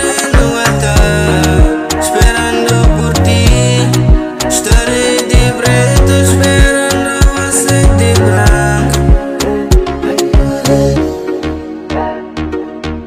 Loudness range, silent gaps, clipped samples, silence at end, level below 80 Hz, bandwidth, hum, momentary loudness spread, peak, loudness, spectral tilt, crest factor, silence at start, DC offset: 4 LU; none; 0.5%; 0 s; -14 dBFS; 16 kHz; none; 9 LU; 0 dBFS; -10 LUFS; -5 dB/octave; 10 dB; 0 s; under 0.1%